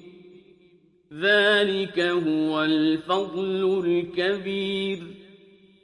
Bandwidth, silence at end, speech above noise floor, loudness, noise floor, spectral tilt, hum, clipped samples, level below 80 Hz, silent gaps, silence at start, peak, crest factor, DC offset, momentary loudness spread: 11 kHz; 0.6 s; 35 dB; -23 LUFS; -58 dBFS; -5.5 dB/octave; none; under 0.1%; -68 dBFS; none; 0.05 s; -8 dBFS; 18 dB; under 0.1%; 8 LU